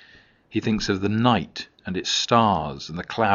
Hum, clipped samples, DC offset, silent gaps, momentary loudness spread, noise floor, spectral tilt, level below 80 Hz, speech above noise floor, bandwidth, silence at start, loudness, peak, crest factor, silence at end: none; under 0.1%; under 0.1%; none; 13 LU; -53 dBFS; -4 dB/octave; -48 dBFS; 31 dB; 7.4 kHz; 0.5 s; -23 LUFS; -2 dBFS; 20 dB; 0 s